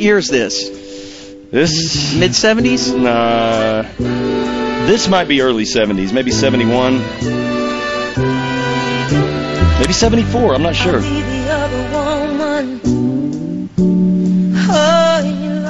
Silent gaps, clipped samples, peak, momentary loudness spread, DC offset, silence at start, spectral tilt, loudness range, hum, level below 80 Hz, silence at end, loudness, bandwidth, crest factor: none; under 0.1%; 0 dBFS; 7 LU; under 0.1%; 0 s; -4.5 dB/octave; 2 LU; none; -30 dBFS; 0 s; -14 LUFS; 8 kHz; 14 dB